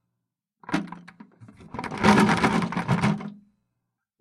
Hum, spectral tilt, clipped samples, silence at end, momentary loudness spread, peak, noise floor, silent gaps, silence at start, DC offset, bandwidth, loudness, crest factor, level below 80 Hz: none; -6 dB/octave; under 0.1%; 0.9 s; 21 LU; -2 dBFS; -83 dBFS; none; 0.7 s; under 0.1%; 13.5 kHz; -23 LUFS; 24 dB; -52 dBFS